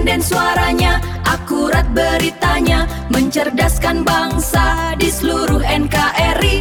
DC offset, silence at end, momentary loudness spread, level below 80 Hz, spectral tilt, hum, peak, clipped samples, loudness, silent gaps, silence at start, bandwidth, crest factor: 0.4%; 0 s; 3 LU; -22 dBFS; -4.5 dB/octave; none; 0 dBFS; under 0.1%; -15 LUFS; none; 0 s; 19 kHz; 14 dB